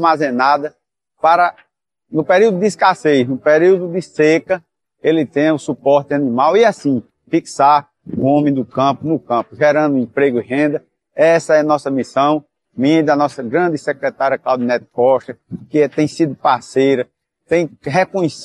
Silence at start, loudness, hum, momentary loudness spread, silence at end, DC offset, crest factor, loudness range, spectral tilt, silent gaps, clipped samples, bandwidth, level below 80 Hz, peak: 0 s; -15 LUFS; none; 8 LU; 0 s; under 0.1%; 14 dB; 2 LU; -6 dB/octave; none; under 0.1%; 11.5 kHz; -62 dBFS; 0 dBFS